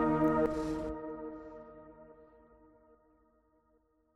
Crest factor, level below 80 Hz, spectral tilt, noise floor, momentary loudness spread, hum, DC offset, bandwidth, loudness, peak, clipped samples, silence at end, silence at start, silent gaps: 18 dB; -56 dBFS; -8 dB/octave; -72 dBFS; 26 LU; none; under 0.1%; 10.5 kHz; -34 LUFS; -18 dBFS; under 0.1%; 1.9 s; 0 s; none